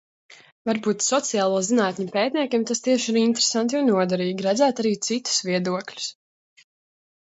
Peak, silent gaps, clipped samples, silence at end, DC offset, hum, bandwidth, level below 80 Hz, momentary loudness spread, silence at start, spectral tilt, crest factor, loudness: -8 dBFS; 0.52-0.65 s; under 0.1%; 1.1 s; under 0.1%; none; 8.2 kHz; -72 dBFS; 7 LU; 0.3 s; -3.5 dB/octave; 16 dB; -22 LUFS